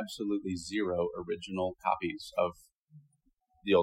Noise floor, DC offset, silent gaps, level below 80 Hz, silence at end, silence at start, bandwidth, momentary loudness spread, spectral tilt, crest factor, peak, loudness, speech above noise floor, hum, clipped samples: -73 dBFS; under 0.1%; 2.72-2.86 s, 3.33-3.37 s; -64 dBFS; 0 s; 0 s; 16 kHz; 4 LU; -5.5 dB/octave; 20 dB; -14 dBFS; -34 LUFS; 39 dB; none; under 0.1%